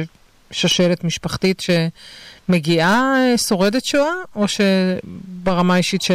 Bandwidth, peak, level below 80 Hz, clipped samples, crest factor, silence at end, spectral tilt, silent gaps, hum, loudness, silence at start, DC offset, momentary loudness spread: 15.5 kHz; -8 dBFS; -48 dBFS; under 0.1%; 10 dB; 0 s; -4.5 dB/octave; none; none; -17 LUFS; 0 s; under 0.1%; 12 LU